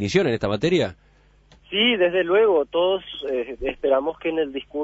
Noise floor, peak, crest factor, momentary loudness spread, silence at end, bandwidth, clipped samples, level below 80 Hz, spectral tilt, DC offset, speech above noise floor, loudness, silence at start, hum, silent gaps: -54 dBFS; -6 dBFS; 16 dB; 9 LU; 0 s; 8 kHz; under 0.1%; -50 dBFS; -5.5 dB/octave; under 0.1%; 33 dB; -22 LUFS; 0 s; none; none